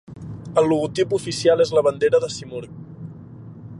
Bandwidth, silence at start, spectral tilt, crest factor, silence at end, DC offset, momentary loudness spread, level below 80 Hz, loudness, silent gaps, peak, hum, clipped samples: 11.5 kHz; 0.1 s; -5.5 dB/octave; 18 dB; 0 s; under 0.1%; 21 LU; -54 dBFS; -20 LUFS; none; -4 dBFS; none; under 0.1%